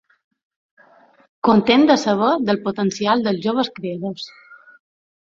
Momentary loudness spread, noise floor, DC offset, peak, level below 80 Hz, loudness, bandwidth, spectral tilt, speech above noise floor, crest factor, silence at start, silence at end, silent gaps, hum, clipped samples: 14 LU; -52 dBFS; under 0.1%; -2 dBFS; -60 dBFS; -18 LUFS; 7.6 kHz; -5.5 dB/octave; 34 dB; 18 dB; 1.45 s; 0.7 s; none; none; under 0.1%